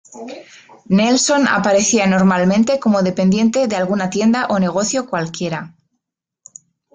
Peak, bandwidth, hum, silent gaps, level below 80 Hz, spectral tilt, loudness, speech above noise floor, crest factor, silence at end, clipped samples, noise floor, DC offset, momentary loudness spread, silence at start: -4 dBFS; 9.4 kHz; none; none; -54 dBFS; -4.5 dB/octave; -15 LUFS; 62 dB; 14 dB; 1.25 s; under 0.1%; -78 dBFS; under 0.1%; 11 LU; 0.1 s